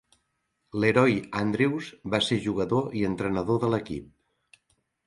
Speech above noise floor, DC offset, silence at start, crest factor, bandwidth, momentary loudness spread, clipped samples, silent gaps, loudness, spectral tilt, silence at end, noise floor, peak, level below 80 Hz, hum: 51 dB; under 0.1%; 0.75 s; 20 dB; 11.5 kHz; 10 LU; under 0.1%; none; -26 LUFS; -6 dB/octave; 1 s; -76 dBFS; -8 dBFS; -56 dBFS; none